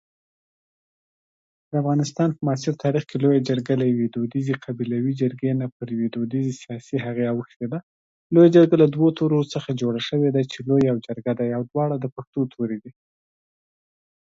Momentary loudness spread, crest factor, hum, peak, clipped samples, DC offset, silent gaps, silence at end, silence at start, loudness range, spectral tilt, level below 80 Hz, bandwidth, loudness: 12 LU; 20 dB; none; -4 dBFS; under 0.1%; under 0.1%; 5.72-5.80 s, 7.56-7.60 s, 7.83-8.30 s, 12.12-12.16 s, 12.27-12.33 s; 1.35 s; 1.7 s; 7 LU; -7.5 dB/octave; -64 dBFS; 7.8 kHz; -22 LUFS